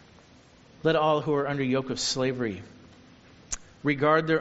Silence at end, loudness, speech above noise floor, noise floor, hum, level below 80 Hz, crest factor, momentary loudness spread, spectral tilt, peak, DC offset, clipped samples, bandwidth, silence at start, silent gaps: 0 s; -27 LUFS; 29 dB; -55 dBFS; none; -56 dBFS; 20 dB; 14 LU; -4 dB/octave; -8 dBFS; under 0.1%; under 0.1%; 8 kHz; 0.85 s; none